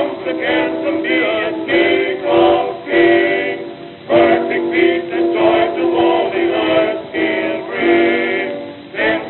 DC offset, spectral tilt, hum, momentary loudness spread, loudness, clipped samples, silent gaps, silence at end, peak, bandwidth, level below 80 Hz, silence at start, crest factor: under 0.1%; -9.5 dB/octave; none; 8 LU; -15 LUFS; under 0.1%; none; 0 s; 0 dBFS; 4.3 kHz; -52 dBFS; 0 s; 14 dB